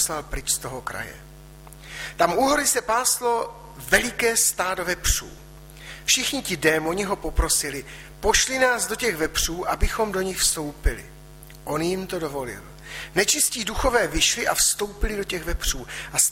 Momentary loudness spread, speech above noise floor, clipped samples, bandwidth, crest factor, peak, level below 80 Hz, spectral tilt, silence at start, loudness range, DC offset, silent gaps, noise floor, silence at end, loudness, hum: 15 LU; 20 dB; under 0.1%; 16.5 kHz; 20 dB; -4 dBFS; -34 dBFS; -2 dB/octave; 0 s; 4 LU; under 0.1%; none; -44 dBFS; 0 s; -22 LUFS; none